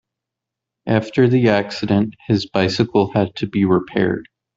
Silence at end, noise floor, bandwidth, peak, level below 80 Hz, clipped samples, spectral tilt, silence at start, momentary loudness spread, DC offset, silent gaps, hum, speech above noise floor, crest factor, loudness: 0.35 s; -84 dBFS; 7.8 kHz; 0 dBFS; -54 dBFS; under 0.1%; -7 dB/octave; 0.85 s; 6 LU; under 0.1%; none; none; 67 dB; 18 dB; -18 LUFS